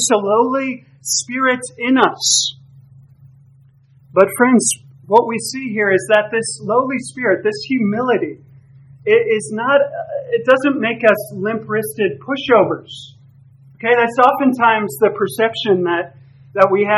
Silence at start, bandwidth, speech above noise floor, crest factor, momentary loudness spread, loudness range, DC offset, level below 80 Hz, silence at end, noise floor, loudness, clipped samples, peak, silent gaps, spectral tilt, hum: 0 s; 14 kHz; 33 dB; 16 dB; 9 LU; 2 LU; under 0.1%; -64 dBFS; 0 s; -49 dBFS; -16 LUFS; under 0.1%; 0 dBFS; none; -3.5 dB/octave; none